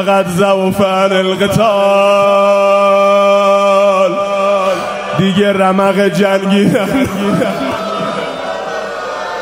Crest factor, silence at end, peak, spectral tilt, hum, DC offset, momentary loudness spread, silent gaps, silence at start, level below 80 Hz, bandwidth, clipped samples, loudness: 12 dB; 0 s; 0 dBFS; -5.5 dB/octave; none; under 0.1%; 10 LU; none; 0 s; -48 dBFS; 16 kHz; under 0.1%; -12 LUFS